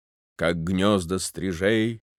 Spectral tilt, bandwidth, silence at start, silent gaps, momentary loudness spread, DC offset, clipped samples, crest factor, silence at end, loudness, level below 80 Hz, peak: -5 dB/octave; 15.5 kHz; 0.4 s; none; 6 LU; under 0.1%; under 0.1%; 18 dB; 0.2 s; -24 LUFS; -54 dBFS; -8 dBFS